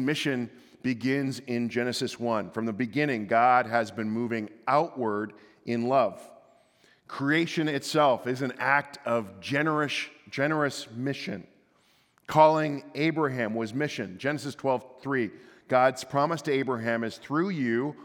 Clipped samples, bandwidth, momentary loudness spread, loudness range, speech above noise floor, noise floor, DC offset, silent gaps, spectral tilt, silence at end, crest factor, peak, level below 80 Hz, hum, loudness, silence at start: under 0.1%; 18 kHz; 9 LU; 3 LU; 38 dB; -65 dBFS; under 0.1%; none; -5.5 dB/octave; 0 s; 22 dB; -6 dBFS; -78 dBFS; none; -28 LUFS; 0 s